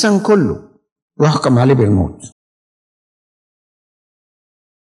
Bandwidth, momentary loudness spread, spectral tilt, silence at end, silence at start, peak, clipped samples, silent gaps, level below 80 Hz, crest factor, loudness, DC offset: 11.5 kHz; 9 LU; -6.5 dB/octave; 2.65 s; 0 s; 0 dBFS; under 0.1%; 0.92-0.96 s, 1.02-1.08 s; -48 dBFS; 16 dB; -14 LUFS; under 0.1%